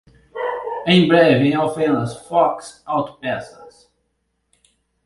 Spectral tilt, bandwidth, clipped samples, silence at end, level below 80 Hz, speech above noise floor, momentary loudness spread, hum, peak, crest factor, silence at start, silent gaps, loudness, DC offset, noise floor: -6.5 dB/octave; 11.5 kHz; under 0.1%; 1.35 s; -56 dBFS; 53 dB; 15 LU; none; 0 dBFS; 20 dB; 0.35 s; none; -18 LUFS; under 0.1%; -71 dBFS